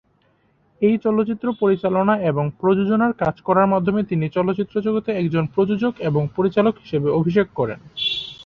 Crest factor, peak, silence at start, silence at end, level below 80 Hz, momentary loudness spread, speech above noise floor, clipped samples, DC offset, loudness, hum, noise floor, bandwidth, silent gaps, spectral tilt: 16 dB; -4 dBFS; 0.8 s; 0 s; -54 dBFS; 5 LU; 42 dB; under 0.1%; under 0.1%; -20 LUFS; none; -61 dBFS; 6.6 kHz; none; -8.5 dB/octave